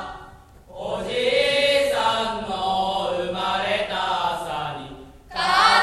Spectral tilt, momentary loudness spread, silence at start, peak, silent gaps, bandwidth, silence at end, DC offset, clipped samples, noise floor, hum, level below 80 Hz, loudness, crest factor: -3 dB/octave; 15 LU; 0 s; -4 dBFS; none; 13.5 kHz; 0 s; under 0.1%; under 0.1%; -46 dBFS; none; -48 dBFS; -22 LUFS; 20 dB